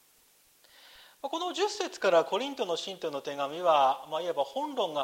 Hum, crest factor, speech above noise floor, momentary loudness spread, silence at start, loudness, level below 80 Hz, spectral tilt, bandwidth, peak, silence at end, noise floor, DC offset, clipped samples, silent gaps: none; 18 dB; 34 dB; 10 LU; 1 s; -30 LUFS; -80 dBFS; -3 dB/octave; 16 kHz; -12 dBFS; 0 s; -64 dBFS; under 0.1%; under 0.1%; none